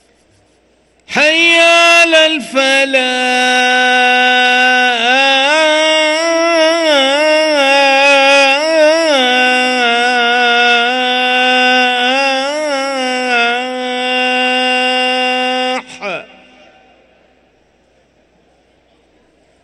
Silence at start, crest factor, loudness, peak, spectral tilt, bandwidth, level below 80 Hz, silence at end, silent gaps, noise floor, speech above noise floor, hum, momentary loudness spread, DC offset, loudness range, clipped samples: 1.1 s; 12 dB; -10 LUFS; 0 dBFS; -0.5 dB/octave; 12 kHz; -60 dBFS; 3.4 s; none; -53 dBFS; 42 dB; none; 9 LU; under 0.1%; 6 LU; under 0.1%